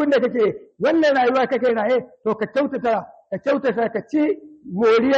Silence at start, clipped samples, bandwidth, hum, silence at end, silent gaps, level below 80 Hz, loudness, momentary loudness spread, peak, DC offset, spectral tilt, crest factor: 0 s; under 0.1%; 7.6 kHz; none; 0 s; none; -62 dBFS; -20 LUFS; 9 LU; -8 dBFS; under 0.1%; -6.5 dB/octave; 12 dB